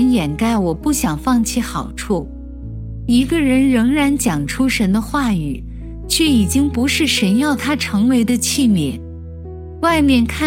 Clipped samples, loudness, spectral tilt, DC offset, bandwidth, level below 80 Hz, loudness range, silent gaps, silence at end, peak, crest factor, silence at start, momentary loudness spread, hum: under 0.1%; -16 LUFS; -4.5 dB/octave; under 0.1%; 16.5 kHz; -32 dBFS; 2 LU; none; 0 s; -2 dBFS; 14 dB; 0 s; 16 LU; none